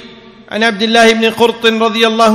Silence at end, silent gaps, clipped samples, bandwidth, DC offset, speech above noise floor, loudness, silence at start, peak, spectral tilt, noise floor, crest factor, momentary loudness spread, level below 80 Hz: 0 s; none; 1%; 15.5 kHz; under 0.1%; 26 dB; -10 LUFS; 0 s; 0 dBFS; -3.5 dB/octave; -36 dBFS; 12 dB; 6 LU; -52 dBFS